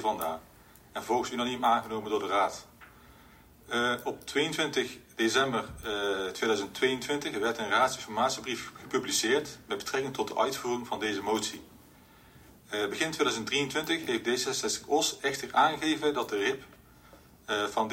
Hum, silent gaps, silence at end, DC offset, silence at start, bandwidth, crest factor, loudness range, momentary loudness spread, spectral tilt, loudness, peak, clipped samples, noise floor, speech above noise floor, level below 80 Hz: none; none; 0 s; under 0.1%; 0 s; 16 kHz; 20 dB; 3 LU; 9 LU; -2.5 dB/octave; -30 LUFS; -12 dBFS; under 0.1%; -56 dBFS; 26 dB; -62 dBFS